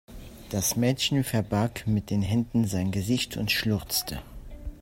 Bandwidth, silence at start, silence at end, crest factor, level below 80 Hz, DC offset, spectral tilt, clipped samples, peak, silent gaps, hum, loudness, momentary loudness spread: 16.5 kHz; 0.1 s; 0 s; 18 dB; -46 dBFS; under 0.1%; -4.5 dB/octave; under 0.1%; -10 dBFS; none; none; -27 LUFS; 17 LU